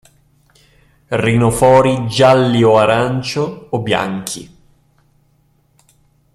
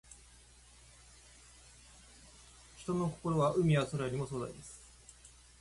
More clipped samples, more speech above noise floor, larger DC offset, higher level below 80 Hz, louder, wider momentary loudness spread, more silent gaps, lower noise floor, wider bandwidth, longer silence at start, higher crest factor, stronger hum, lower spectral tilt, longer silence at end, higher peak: neither; first, 44 dB vs 27 dB; neither; first, -44 dBFS vs -60 dBFS; first, -14 LUFS vs -34 LUFS; second, 12 LU vs 26 LU; neither; about the same, -57 dBFS vs -60 dBFS; first, 14 kHz vs 11.5 kHz; first, 1.1 s vs 0.1 s; about the same, 16 dB vs 20 dB; neither; about the same, -5.5 dB/octave vs -6.5 dB/octave; first, 1.9 s vs 0.3 s; first, 0 dBFS vs -18 dBFS